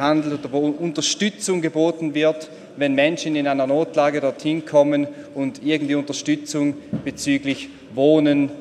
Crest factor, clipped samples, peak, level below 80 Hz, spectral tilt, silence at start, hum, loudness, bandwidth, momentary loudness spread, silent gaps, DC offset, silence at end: 18 dB; under 0.1%; -4 dBFS; -62 dBFS; -4.5 dB/octave; 0 s; none; -21 LUFS; 12.5 kHz; 10 LU; none; under 0.1%; 0 s